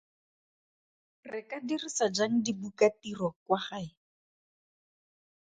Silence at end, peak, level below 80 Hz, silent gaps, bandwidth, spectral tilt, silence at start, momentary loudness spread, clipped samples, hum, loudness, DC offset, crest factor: 1.55 s; -12 dBFS; -74 dBFS; 3.36-3.46 s; 9.4 kHz; -4 dB/octave; 1.25 s; 14 LU; under 0.1%; none; -31 LUFS; under 0.1%; 22 dB